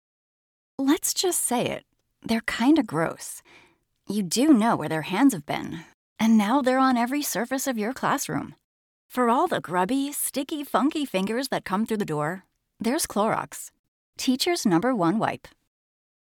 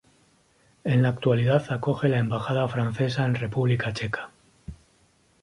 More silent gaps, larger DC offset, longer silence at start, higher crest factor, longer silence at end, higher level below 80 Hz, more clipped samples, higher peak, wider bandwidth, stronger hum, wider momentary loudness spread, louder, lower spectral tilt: first, 5.94-6.16 s, 8.64-9.09 s, 13.79-14.13 s vs none; neither; about the same, 0.8 s vs 0.85 s; about the same, 18 dB vs 18 dB; first, 1 s vs 0.7 s; second, -64 dBFS vs -54 dBFS; neither; about the same, -8 dBFS vs -8 dBFS; first, 19 kHz vs 11 kHz; neither; second, 15 LU vs 20 LU; about the same, -24 LUFS vs -25 LUFS; second, -4 dB/octave vs -7.5 dB/octave